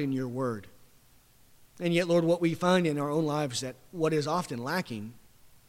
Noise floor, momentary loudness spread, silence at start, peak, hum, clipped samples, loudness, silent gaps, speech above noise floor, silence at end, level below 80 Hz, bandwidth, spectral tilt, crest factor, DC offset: -60 dBFS; 13 LU; 0 s; -12 dBFS; none; under 0.1%; -29 LUFS; none; 31 dB; 0.25 s; -66 dBFS; 16.5 kHz; -5.5 dB/octave; 18 dB; under 0.1%